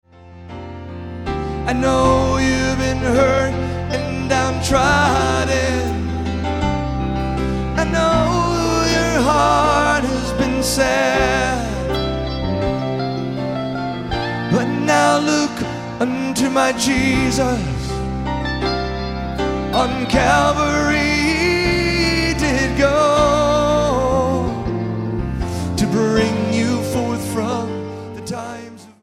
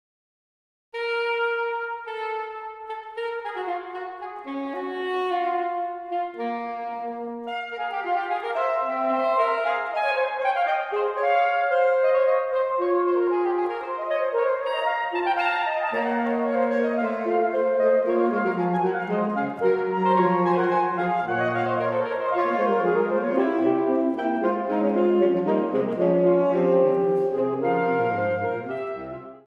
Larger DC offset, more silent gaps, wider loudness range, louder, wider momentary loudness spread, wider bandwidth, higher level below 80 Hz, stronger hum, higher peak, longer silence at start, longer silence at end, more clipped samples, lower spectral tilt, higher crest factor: first, 0.2% vs under 0.1%; neither; second, 4 LU vs 7 LU; first, -18 LUFS vs -24 LUFS; about the same, 9 LU vs 11 LU; first, 15.5 kHz vs 6.4 kHz; first, -30 dBFS vs -70 dBFS; neither; first, -2 dBFS vs -8 dBFS; second, 0.15 s vs 0.95 s; about the same, 0.1 s vs 0.1 s; neither; second, -5 dB/octave vs -8 dB/octave; about the same, 16 dB vs 16 dB